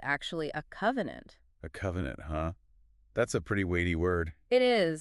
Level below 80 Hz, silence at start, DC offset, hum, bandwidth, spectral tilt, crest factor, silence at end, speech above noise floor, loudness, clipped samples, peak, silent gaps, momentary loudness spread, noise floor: -50 dBFS; 0 s; under 0.1%; none; 11.5 kHz; -5.5 dB/octave; 18 dB; 0 s; 32 dB; -31 LUFS; under 0.1%; -14 dBFS; none; 12 LU; -63 dBFS